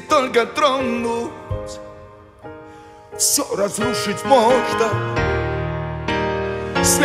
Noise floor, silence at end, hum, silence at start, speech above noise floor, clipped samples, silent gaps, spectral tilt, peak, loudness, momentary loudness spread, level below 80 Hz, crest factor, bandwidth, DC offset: -42 dBFS; 0 s; none; 0 s; 23 dB; under 0.1%; none; -3.5 dB/octave; -2 dBFS; -19 LUFS; 19 LU; -38 dBFS; 18 dB; 16 kHz; under 0.1%